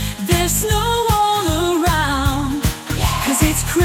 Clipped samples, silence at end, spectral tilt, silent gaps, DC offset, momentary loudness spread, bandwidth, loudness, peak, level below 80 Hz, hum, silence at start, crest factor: under 0.1%; 0 s; -4 dB/octave; none; under 0.1%; 4 LU; 17.5 kHz; -17 LUFS; -2 dBFS; -26 dBFS; none; 0 s; 14 dB